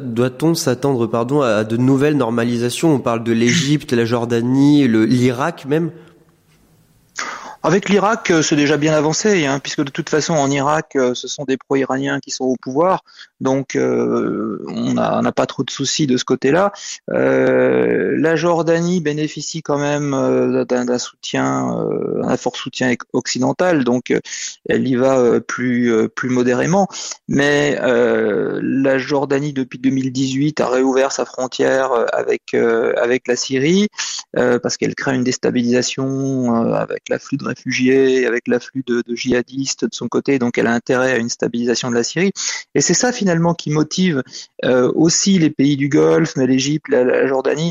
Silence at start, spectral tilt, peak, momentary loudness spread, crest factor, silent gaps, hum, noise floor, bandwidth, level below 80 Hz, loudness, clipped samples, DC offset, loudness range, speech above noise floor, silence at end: 0 s; -5 dB/octave; -4 dBFS; 7 LU; 14 dB; none; none; -54 dBFS; 14.5 kHz; -56 dBFS; -17 LUFS; under 0.1%; under 0.1%; 3 LU; 37 dB; 0 s